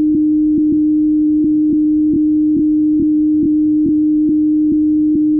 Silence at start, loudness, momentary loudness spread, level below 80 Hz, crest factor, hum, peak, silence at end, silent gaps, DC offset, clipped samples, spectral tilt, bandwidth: 0 s; -13 LUFS; 0 LU; -42 dBFS; 4 dB; none; -8 dBFS; 0 s; none; under 0.1%; under 0.1%; -15 dB/octave; 0.5 kHz